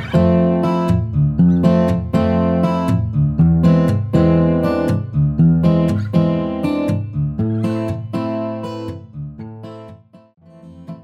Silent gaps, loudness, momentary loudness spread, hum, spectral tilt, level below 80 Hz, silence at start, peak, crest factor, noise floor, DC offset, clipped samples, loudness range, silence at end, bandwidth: none; -16 LUFS; 16 LU; none; -9.5 dB/octave; -34 dBFS; 0 s; 0 dBFS; 16 dB; -41 dBFS; under 0.1%; under 0.1%; 9 LU; 0 s; 7.8 kHz